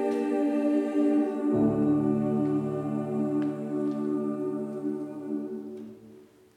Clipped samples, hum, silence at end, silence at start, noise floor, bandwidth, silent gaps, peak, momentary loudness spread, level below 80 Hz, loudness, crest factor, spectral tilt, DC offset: under 0.1%; none; 0.3 s; 0 s; -53 dBFS; 9.2 kHz; none; -14 dBFS; 10 LU; -64 dBFS; -28 LUFS; 14 dB; -9 dB/octave; under 0.1%